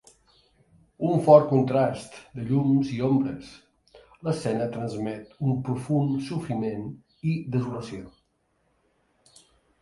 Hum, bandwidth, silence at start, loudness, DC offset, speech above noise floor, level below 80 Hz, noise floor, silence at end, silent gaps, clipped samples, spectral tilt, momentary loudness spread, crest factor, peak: none; 11.5 kHz; 1 s; -25 LUFS; under 0.1%; 46 dB; -60 dBFS; -71 dBFS; 1.75 s; none; under 0.1%; -8.5 dB/octave; 17 LU; 24 dB; -2 dBFS